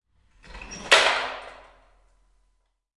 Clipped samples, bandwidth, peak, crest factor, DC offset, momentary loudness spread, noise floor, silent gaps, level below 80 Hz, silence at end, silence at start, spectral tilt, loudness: under 0.1%; 11.5 kHz; -2 dBFS; 28 dB; under 0.1%; 26 LU; -70 dBFS; none; -54 dBFS; 1.45 s; 0.5 s; 0 dB/octave; -20 LUFS